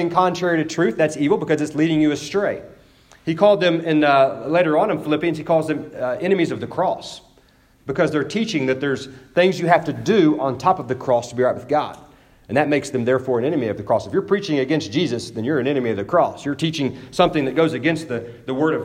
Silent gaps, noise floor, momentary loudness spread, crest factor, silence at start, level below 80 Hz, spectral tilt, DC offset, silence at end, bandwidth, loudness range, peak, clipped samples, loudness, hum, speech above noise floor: none; -54 dBFS; 8 LU; 18 dB; 0 s; -56 dBFS; -6 dB/octave; under 0.1%; 0 s; 12.5 kHz; 4 LU; -2 dBFS; under 0.1%; -20 LUFS; none; 35 dB